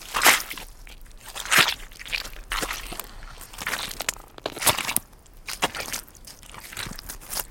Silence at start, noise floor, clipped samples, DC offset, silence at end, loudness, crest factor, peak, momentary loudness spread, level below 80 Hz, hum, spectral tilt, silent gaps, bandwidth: 0 s; -47 dBFS; under 0.1%; under 0.1%; 0 s; -25 LUFS; 28 dB; 0 dBFS; 23 LU; -44 dBFS; none; -0.5 dB/octave; none; 17 kHz